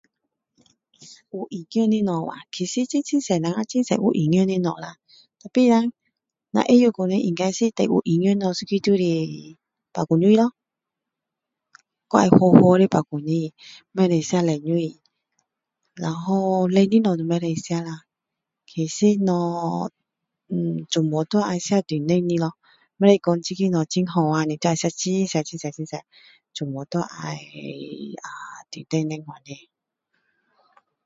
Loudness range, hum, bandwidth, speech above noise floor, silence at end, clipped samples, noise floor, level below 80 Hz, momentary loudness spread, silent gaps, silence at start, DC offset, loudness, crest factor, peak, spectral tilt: 11 LU; none; 7.8 kHz; 64 dB; 1.5 s; under 0.1%; -85 dBFS; -64 dBFS; 17 LU; none; 1 s; under 0.1%; -21 LUFS; 22 dB; 0 dBFS; -6.5 dB/octave